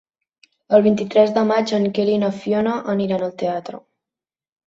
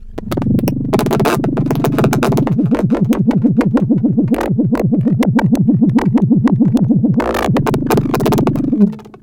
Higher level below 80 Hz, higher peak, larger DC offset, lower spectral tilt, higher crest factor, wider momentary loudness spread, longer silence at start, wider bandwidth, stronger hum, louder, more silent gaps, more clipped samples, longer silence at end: second, -62 dBFS vs -34 dBFS; about the same, -2 dBFS vs 0 dBFS; neither; about the same, -7 dB/octave vs -8 dB/octave; about the same, 18 dB vs 14 dB; first, 9 LU vs 4 LU; first, 0.7 s vs 0 s; second, 7.6 kHz vs 17 kHz; neither; second, -19 LUFS vs -14 LUFS; neither; neither; first, 0.9 s vs 0.05 s